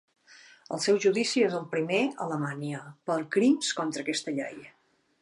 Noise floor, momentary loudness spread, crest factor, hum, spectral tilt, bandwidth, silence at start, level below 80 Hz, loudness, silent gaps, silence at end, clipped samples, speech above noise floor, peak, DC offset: -55 dBFS; 13 LU; 16 dB; none; -4 dB/octave; 11.5 kHz; 0.3 s; -82 dBFS; -28 LUFS; none; 0.55 s; under 0.1%; 27 dB; -12 dBFS; under 0.1%